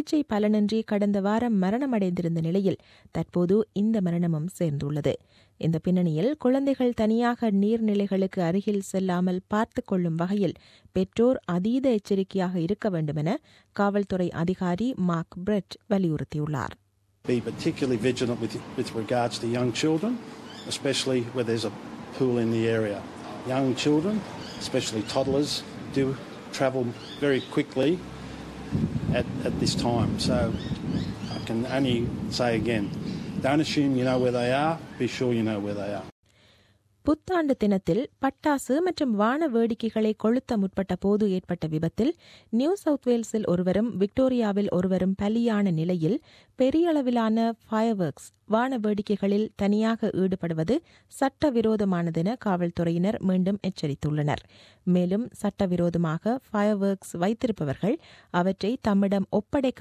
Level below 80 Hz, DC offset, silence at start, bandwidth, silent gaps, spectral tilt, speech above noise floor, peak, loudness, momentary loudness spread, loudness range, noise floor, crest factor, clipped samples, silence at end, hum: -52 dBFS; under 0.1%; 0 s; 14 kHz; 36.12-36.23 s; -6.5 dB/octave; 37 dB; -10 dBFS; -26 LUFS; 7 LU; 3 LU; -63 dBFS; 16 dB; under 0.1%; 0 s; none